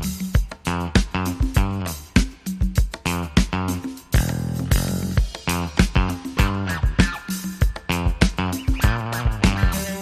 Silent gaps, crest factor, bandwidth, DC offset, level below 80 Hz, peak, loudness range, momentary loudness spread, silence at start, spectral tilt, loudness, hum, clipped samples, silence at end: none; 20 dB; 15.5 kHz; under 0.1%; -24 dBFS; -2 dBFS; 1 LU; 5 LU; 0 s; -5 dB/octave; -23 LUFS; none; under 0.1%; 0 s